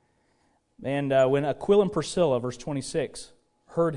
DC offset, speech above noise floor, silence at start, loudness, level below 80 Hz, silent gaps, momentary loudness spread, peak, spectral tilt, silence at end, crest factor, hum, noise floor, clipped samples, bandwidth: under 0.1%; 43 dB; 0.8 s; -26 LUFS; -56 dBFS; none; 12 LU; -10 dBFS; -6 dB/octave; 0 s; 16 dB; none; -68 dBFS; under 0.1%; 11 kHz